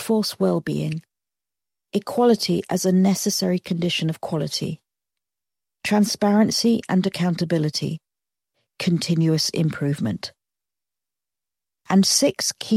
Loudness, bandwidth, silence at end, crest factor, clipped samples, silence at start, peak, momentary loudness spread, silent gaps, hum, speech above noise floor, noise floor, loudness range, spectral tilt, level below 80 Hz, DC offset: -21 LUFS; 16 kHz; 0 s; 18 dB; under 0.1%; 0 s; -4 dBFS; 11 LU; none; none; 69 dB; -89 dBFS; 3 LU; -5 dB/octave; -64 dBFS; under 0.1%